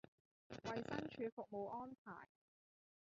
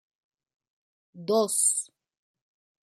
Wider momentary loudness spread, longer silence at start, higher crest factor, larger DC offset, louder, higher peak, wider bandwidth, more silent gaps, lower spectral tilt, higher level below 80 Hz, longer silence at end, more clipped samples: second, 13 LU vs 18 LU; second, 0.5 s vs 1.15 s; about the same, 22 dB vs 20 dB; neither; second, -50 LUFS vs -24 LUFS; second, -30 dBFS vs -12 dBFS; second, 7.4 kHz vs 14.5 kHz; first, 1.32-1.37 s, 1.98-2.05 s vs none; first, -4.5 dB/octave vs -3 dB/octave; first, -78 dBFS vs -86 dBFS; second, 0.85 s vs 1.1 s; neither